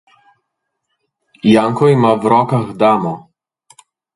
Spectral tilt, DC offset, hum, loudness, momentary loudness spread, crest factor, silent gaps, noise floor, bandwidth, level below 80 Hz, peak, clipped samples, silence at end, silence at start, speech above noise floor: -7.5 dB/octave; under 0.1%; none; -13 LUFS; 7 LU; 16 dB; none; -74 dBFS; 11.5 kHz; -56 dBFS; 0 dBFS; under 0.1%; 0.95 s; 1.45 s; 62 dB